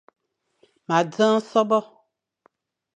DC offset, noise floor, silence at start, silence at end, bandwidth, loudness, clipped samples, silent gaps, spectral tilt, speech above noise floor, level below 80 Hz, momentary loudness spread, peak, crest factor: under 0.1%; -65 dBFS; 0.9 s; 1.15 s; 8.8 kHz; -21 LUFS; under 0.1%; none; -5.5 dB/octave; 45 dB; -80 dBFS; 4 LU; -6 dBFS; 20 dB